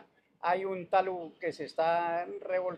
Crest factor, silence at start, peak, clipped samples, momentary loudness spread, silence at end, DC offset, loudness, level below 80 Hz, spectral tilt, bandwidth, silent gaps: 18 dB; 0.45 s; -14 dBFS; under 0.1%; 7 LU; 0 s; under 0.1%; -32 LUFS; -80 dBFS; -6 dB/octave; 10 kHz; none